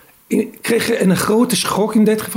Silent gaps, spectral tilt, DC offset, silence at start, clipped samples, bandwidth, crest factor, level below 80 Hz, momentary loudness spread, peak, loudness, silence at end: none; -4.5 dB/octave; under 0.1%; 0.3 s; under 0.1%; 16 kHz; 12 dB; -54 dBFS; 6 LU; -4 dBFS; -16 LUFS; 0 s